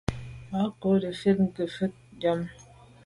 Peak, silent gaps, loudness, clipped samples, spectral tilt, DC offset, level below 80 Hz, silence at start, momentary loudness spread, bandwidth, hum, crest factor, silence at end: -10 dBFS; none; -28 LUFS; under 0.1%; -7.5 dB/octave; under 0.1%; -50 dBFS; 0.1 s; 10 LU; 11.5 kHz; none; 18 dB; 0.45 s